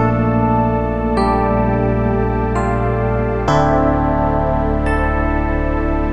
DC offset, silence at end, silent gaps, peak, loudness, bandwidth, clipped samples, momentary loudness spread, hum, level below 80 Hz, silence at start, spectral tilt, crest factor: under 0.1%; 0 s; none; -2 dBFS; -17 LUFS; 9.8 kHz; under 0.1%; 3 LU; none; -22 dBFS; 0 s; -8.5 dB/octave; 14 dB